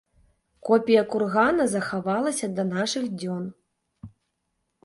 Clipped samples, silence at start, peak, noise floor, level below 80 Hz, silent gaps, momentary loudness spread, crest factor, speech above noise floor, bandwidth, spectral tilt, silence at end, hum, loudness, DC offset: under 0.1%; 0.65 s; -6 dBFS; -77 dBFS; -64 dBFS; none; 11 LU; 20 dB; 53 dB; 11.5 kHz; -5 dB/octave; 0.75 s; none; -24 LUFS; under 0.1%